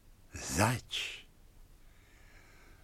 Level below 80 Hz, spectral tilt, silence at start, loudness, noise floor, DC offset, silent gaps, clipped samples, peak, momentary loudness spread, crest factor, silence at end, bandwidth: -56 dBFS; -3.5 dB/octave; 0.05 s; -34 LUFS; -58 dBFS; under 0.1%; none; under 0.1%; -10 dBFS; 18 LU; 28 dB; 0.1 s; 16.5 kHz